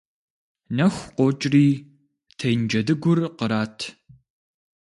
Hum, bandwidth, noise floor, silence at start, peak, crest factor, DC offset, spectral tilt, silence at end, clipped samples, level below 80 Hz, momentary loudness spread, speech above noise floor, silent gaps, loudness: none; 11.5 kHz; -60 dBFS; 0.7 s; -6 dBFS; 16 dB; under 0.1%; -6.5 dB/octave; 0.95 s; under 0.1%; -60 dBFS; 11 LU; 39 dB; none; -22 LUFS